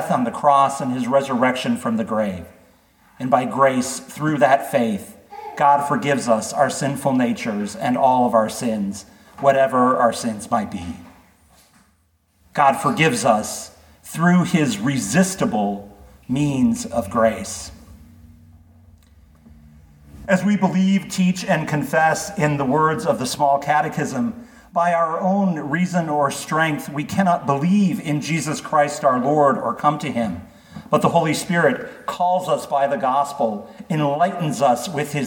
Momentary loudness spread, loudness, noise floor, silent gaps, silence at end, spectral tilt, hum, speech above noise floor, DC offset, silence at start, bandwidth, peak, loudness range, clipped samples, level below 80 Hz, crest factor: 10 LU; -19 LUFS; -62 dBFS; none; 0 s; -5.5 dB/octave; none; 43 dB; under 0.1%; 0 s; 19 kHz; -2 dBFS; 4 LU; under 0.1%; -54 dBFS; 18 dB